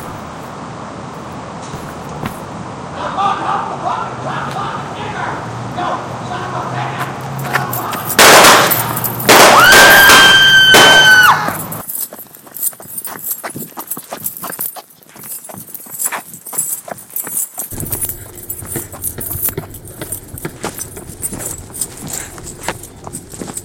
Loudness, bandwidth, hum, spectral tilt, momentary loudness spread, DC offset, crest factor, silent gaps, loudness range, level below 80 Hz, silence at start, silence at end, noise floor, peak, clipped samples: -10 LUFS; over 20 kHz; none; -1.5 dB/octave; 24 LU; under 0.1%; 14 dB; none; 18 LU; -44 dBFS; 0 s; 0 s; -36 dBFS; 0 dBFS; 0.6%